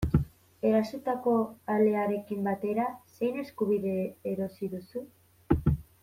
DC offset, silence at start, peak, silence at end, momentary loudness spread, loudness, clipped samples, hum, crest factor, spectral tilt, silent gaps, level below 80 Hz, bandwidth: under 0.1%; 0 s; -10 dBFS; 0.2 s; 9 LU; -30 LUFS; under 0.1%; none; 18 dB; -9 dB/octave; none; -44 dBFS; 16 kHz